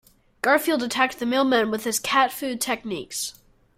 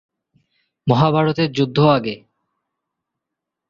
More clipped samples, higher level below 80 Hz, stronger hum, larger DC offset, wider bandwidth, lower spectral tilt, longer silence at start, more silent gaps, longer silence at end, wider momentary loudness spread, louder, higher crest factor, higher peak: neither; second, -62 dBFS vs -54 dBFS; neither; neither; first, 16 kHz vs 7.2 kHz; second, -2 dB/octave vs -8 dB/octave; second, 0.45 s vs 0.85 s; neither; second, 0.45 s vs 1.55 s; second, 9 LU vs 13 LU; second, -23 LUFS vs -17 LUFS; about the same, 20 dB vs 20 dB; about the same, -4 dBFS vs -2 dBFS